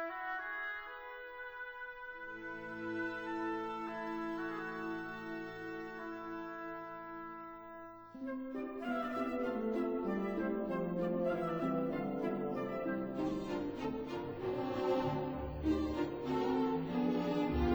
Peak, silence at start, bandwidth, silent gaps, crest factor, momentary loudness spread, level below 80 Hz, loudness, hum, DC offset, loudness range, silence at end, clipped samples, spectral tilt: -22 dBFS; 0 s; over 20 kHz; none; 16 dB; 11 LU; -54 dBFS; -39 LUFS; none; under 0.1%; 7 LU; 0 s; under 0.1%; -7.5 dB/octave